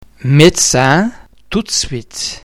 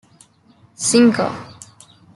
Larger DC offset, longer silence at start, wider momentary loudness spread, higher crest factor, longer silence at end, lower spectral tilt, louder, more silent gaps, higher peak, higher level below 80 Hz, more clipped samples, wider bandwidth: neither; second, 0.2 s vs 0.8 s; second, 13 LU vs 21 LU; about the same, 14 dB vs 18 dB; second, 0.05 s vs 0.65 s; about the same, -4 dB/octave vs -3.5 dB/octave; first, -12 LUFS vs -16 LUFS; neither; about the same, 0 dBFS vs -2 dBFS; first, -36 dBFS vs -60 dBFS; first, 0.9% vs under 0.1%; first, 16.5 kHz vs 12 kHz